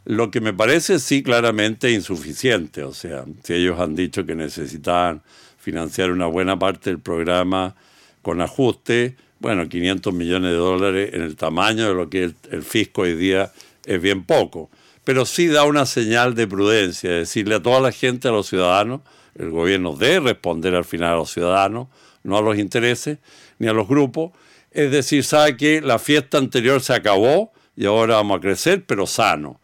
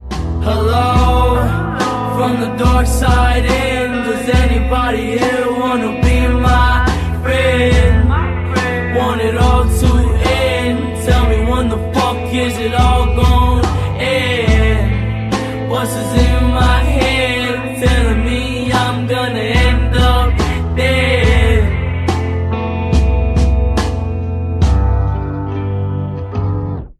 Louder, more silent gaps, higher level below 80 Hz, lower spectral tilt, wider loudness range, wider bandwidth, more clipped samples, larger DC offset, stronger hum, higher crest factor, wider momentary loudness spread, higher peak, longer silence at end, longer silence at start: second, -19 LUFS vs -14 LUFS; neither; second, -52 dBFS vs -16 dBFS; second, -4.5 dB/octave vs -6 dB/octave; first, 5 LU vs 2 LU; first, 17.5 kHz vs 13.5 kHz; neither; neither; neither; about the same, 16 dB vs 12 dB; first, 11 LU vs 6 LU; about the same, -2 dBFS vs 0 dBFS; about the same, 0.1 s vs 0.05 s; about the same, 0.05 s vs 0 s